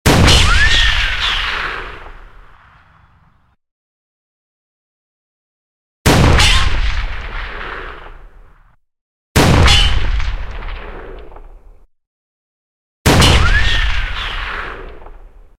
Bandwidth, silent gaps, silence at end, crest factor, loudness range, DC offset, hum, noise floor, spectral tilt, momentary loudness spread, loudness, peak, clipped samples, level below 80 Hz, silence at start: 16.5 kHz; 3.71-6.05 s, 9.01-9.35 s, 12.07-13.05 s; 0.3 s; 16 dB; 7 LU; under 0.1%; none; -54 dBFS; -4 dB/octave; 21 LU; -13 LUFS; 0 dBFS; under 0.1%; -20 dBFS; 0.05 s